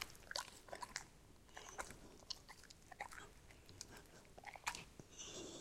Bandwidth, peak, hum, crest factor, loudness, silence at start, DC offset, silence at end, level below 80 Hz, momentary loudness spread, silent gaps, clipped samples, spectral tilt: 16.5 kHz; -24 dBFS; none; 30 dB; -52 LUFS; 0 s; under 0.1%; 0 s; -68 dBFS; 13 LU; none; under 0.1%; -1.5 dB/octave